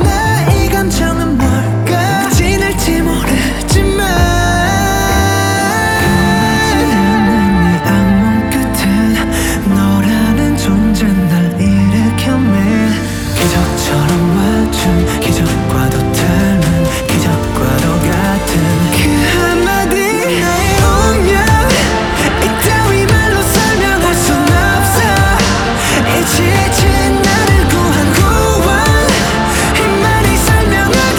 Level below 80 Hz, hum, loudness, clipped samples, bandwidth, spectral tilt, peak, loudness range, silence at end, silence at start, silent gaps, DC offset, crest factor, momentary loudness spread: -20 dBFS; none; -11 LUFS; under 0.1%; over 20 kHz; -5 dB/octave; 0 dBFS; 2 LU; 0 s; 0 s; none; under 0.1%; 10 dB; 3 LU